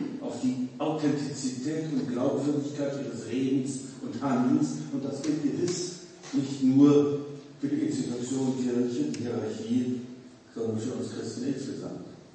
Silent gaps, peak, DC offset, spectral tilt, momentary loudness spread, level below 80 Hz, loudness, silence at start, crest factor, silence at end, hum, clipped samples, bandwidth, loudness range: none; -8 dBFS; under 0.1%; -6 dB/octave; 11 LU; -72 dBFS; -29 LUFS; 0 s; 20 dB; 0.05 s; none; under 0.1%; 8.8 kHz; 5 LU